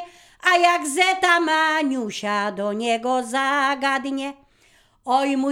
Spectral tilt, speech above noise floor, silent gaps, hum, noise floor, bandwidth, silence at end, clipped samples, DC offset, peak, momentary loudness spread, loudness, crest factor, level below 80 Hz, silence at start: -2.5 dB/octave; 37 dB; none; none; -58 dBFS; 17 kHz; 0 s; under 0.1%; under 0.1%; -2 dBFS; 9 LU; -20 LUFS; 18 dB; -66 dBFS; 0 s